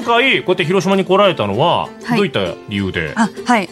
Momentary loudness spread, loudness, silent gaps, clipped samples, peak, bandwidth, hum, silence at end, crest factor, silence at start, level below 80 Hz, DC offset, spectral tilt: 8 LU; -15 LUFS; none; under 0.1%; -2 dBFS; 13 kHz; none; 0 s; 14 dB; 0 s; -52 dBFS; under 0.1%; -5.5 dB/octave